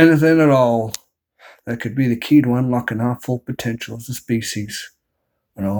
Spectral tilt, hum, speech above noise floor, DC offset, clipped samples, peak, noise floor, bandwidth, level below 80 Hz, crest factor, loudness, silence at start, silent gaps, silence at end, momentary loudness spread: -6.5 dB/octave; none; 56 dB; under 0.1%; under 0.1%; 0 dBFS; -73 dBFS; over 20 kHz; -56 dBFS; 18 dB; -18 LUFS; 0 s; none; 0 s; 16 LU